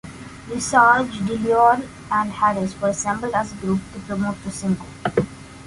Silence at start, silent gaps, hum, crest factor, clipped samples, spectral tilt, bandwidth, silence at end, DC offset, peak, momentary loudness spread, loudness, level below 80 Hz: 0.05 s; none; none; 18 dB; under 0.1%; -5 dB/octave; 11.5 kHz; 0 s; under 0.1%; -2 dBFS; 12 LU; -21 LUFS; -48 dBFS